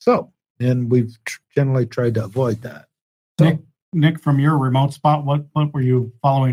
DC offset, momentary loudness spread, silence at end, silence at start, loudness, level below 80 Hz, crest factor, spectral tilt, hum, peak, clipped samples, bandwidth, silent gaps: under 0.1%; 10 LU; 0 s; 0.05 s; -19 LUFS; -58 dBFS; 16 dB; -8 dB/octave; none; -2 dBFS; under 0.1%; 12 kHz; 0.50-0.55 s, 3.01-3.35 s, 3.82-3.92 s